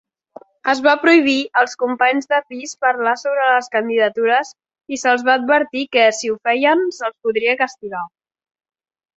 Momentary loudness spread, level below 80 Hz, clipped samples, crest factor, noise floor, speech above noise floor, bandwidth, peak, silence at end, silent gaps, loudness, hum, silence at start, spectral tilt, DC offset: 10 LU; -68 dBFS; under 0.1%; 16 dB; -43 dBFS; 27 dB; 8.2 kHz; -2 dBFS; 1.1 s; none; -16 LUFS; none; 0.65 s; -2.5 dB/octave; under 0.1%